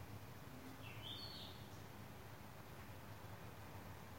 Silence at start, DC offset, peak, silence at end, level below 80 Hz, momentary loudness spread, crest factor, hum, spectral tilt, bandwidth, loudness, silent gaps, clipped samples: 0 s; under 0.1%; -38 dBFS; 0 s; -70 dBFS; 7 LU; 16 dB; none; -4.5 dB/octave; 16.5 kHz; -54 LUFS; none; under 0.1%